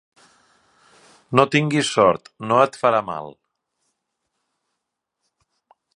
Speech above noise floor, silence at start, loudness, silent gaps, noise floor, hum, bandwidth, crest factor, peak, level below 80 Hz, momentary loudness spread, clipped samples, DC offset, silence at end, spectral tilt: 61 dB; 1.3 s; -19 LUFS; none; -80 dBFS; none; 11 kHz; 22 dB; 0 dBFS; -62 dBFS; 14 LU; under 0.1%; under 0.1%; 2.65 s; -5 dB/octave